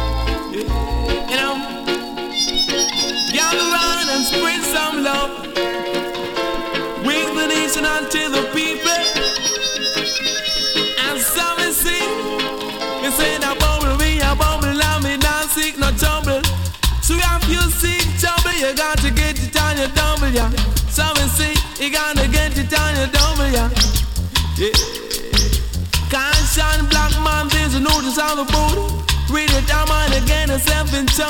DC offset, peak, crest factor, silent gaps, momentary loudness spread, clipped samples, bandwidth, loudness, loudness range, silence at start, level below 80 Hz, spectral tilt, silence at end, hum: under 0.1%; -2 dBFS; 16 dB; none; 6 LU; under 0.1%; 17.5 kHz; -17 LUFS; 2 LU; 0 s; -22 dBFS; -3 dB/octave; 0 s; none